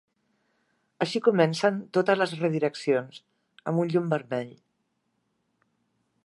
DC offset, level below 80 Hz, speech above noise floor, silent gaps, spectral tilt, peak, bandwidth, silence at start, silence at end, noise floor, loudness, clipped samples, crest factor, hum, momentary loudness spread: under 0.1%; -78 dBFS; 50 dB; none; -6 dB/octave; -6 dBFS; 11.5 kHz; 1 s; 1.75 s; -76 dBFS; -26 LUFS; under 0.1%; 22 dB; none; 11 LU